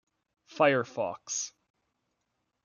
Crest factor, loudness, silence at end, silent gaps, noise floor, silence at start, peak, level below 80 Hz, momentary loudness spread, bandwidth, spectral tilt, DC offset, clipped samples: 22 dB; -29 LUFS; 1.15 s; none; -81 dBFS; 0.5 s; -10 dBFS; -80 dBFS; 10 LU; 10 kHz; -3.5 dB/octave; under 0.1%; under 0.1%